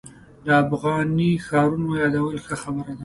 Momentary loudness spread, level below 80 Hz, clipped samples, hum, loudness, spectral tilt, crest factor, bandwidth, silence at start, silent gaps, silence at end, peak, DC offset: 10 LU; -52 dBFS; under 0.1%; none; -22 LUFS; -7 dB/octave; 18 dB; 11.5 kHz; 0.05 s; none; 0 s; -4 dBFS; under 0.1%